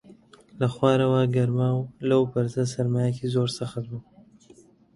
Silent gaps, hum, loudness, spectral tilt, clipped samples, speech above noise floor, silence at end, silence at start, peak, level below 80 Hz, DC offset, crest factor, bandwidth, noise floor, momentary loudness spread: none; none; -25 LUFS; -7.5 dB/octave; under 0.1%; 31 dB; 0.95 s; 0.1 s; -6 dBFS; -60 dBFS; under 0.1%; 18 dB; 11.5 kHz; -54 dBFS; 11 LU